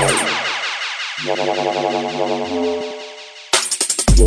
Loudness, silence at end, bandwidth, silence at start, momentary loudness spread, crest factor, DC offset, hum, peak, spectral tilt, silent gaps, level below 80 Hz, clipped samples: -19 LUFS; 0 s; 11 kHz; 0 s; 10 LU; 16 dB; under 0.1%; none; -2 dBFS; -3 dB/octave; none; -26 dBFS; under 0.1%